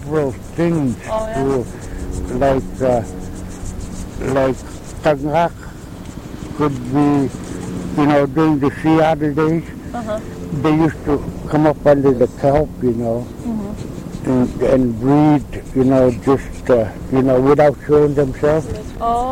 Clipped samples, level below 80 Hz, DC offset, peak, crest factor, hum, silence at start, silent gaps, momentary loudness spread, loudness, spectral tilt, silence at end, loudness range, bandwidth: under 0.1%; -34 dBFS; under 0.1%; 0 dBFS; 16 dB; none; 0 s; none; 15 LU; -17 LUFS; -7.5 dB/octave; 0 s; 6 LU; 16 kHz